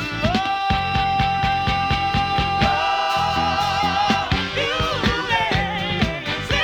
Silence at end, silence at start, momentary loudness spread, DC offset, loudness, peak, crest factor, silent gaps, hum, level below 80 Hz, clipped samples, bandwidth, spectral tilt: 0 s; 0 s; 3 LU; under 0.1%; -20 LUFS; -4 dBFS; 16 dB; none; none; -34 dBFS; under 0.1%; 19 kHz; -4.5 dB/octave